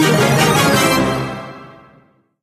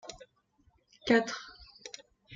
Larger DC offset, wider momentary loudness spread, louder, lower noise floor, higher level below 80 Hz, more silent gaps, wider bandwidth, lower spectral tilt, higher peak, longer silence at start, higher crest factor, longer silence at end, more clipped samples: neither; second, 16 LU vs 22 LU; first, -14 LUFS vs -30 LUFS; second, -52 dBFS vs -70 dBFS; first, -42 dBFS vs -66 dBFS; neither; first, 15 kHz vs 7.8 kHz; about the same, -4.5 dB/octave vs -4 dB/octave; first, 0 dBFS vs -12 dBFS; about the same, 0 s vs 0.05 s; second, 16 dB vs 24 dB; first, 0.7 s vs 0 s; neither